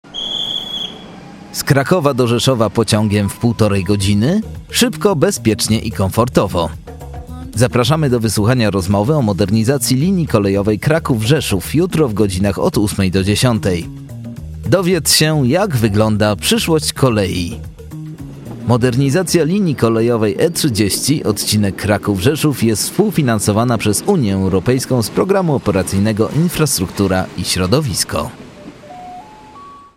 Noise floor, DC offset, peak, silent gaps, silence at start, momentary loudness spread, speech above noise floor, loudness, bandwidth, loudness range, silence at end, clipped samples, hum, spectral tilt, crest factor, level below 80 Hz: -37 dBFS; under 0.1%; 0 dBFS; none; 0.05 s; 14 LU; 23 dB; -15 LUFS; 16.5 kHz; 2 LU; 0.15 s; under 0.1%; none; -5 dB/octave; 14 dB; -38 dBFS